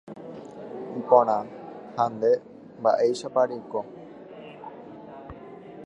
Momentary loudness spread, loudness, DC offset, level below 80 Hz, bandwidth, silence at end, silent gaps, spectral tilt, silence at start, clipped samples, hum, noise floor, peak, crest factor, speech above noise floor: 23 LU; -25 LUFS; under 0.1%; -64 dBFS; 10.5 kHz; 0 s; none; -6 dB/octave; 0.05 s; under 0.1%; none; -43 dBFS; -4 dBFS; 24 dB; 20 dB